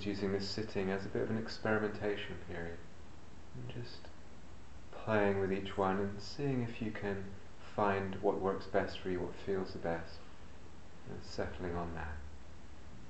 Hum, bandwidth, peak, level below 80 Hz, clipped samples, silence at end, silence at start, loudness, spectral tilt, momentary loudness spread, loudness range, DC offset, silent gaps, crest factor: none; 8.2 kHz; -16 dBFS; -56 dBFS; under 0.1%; 0 s; 0 s; -38 LUFS; -6.5 dB/octave; 21 LU; 6 LU; 0.6%; none; 22 dB